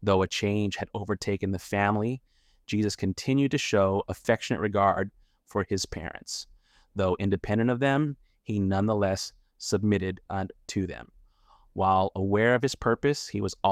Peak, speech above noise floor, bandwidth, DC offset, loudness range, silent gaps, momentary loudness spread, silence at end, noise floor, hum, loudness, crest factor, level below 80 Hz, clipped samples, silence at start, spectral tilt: -8 dBFS; 33 dB; 15 kHz; under 0.1%; 3 LU; none; 12 LU; 0 s; -60 dBFS; none; -28 LUFS; 18 dB; -54 dBFS; under 0.1%; 0 s; -5.5 dB/octave